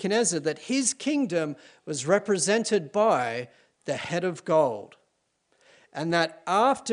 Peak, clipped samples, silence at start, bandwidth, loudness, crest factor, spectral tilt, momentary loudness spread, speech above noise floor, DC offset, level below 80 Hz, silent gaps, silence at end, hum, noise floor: -8 dBFS; under 0.1%; 0 s; 10.5 kHz; -26 LUFS; 18 dB; -3.5 dB/octave; 12 LU; 47 dB; under 0.1%; -74 dBFS; none; 0 s; none; -73 dBFS